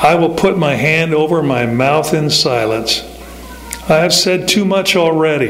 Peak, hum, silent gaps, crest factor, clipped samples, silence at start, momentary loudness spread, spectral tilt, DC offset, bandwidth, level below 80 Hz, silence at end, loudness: 0 dBFS; none; none; 12 dB; under 0.1%; 0 s; 14 LU; -4 dB/octave; under 0.1%; 16 kHz; -40 dBFS; 0 s; -13 LUFS